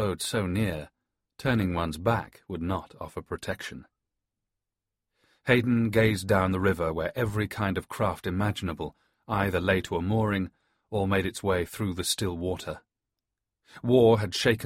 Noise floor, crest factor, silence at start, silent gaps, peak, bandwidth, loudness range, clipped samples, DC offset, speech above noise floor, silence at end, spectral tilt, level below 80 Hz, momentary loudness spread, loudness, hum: -88 dBFS; 20 dB; 0 s; none; -8 dBFS; 16 kHz; 6 LU; under 0.1%; under 0.1%; 61 dB; 0 s; -5.5 dB/octave; -50 dBFS; 14 LU; -28 LUFS; none